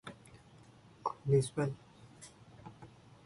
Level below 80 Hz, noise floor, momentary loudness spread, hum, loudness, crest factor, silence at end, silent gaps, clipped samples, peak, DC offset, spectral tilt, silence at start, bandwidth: -68 dBFS; -59 dBFS; 26 LU; none; -35 LUFS; 20 dB; 0.4 s; none; under 0.1%; -18 dBFS; under 0.1%; -6.5 dB/octave; 0.05 s; 11.5 kHz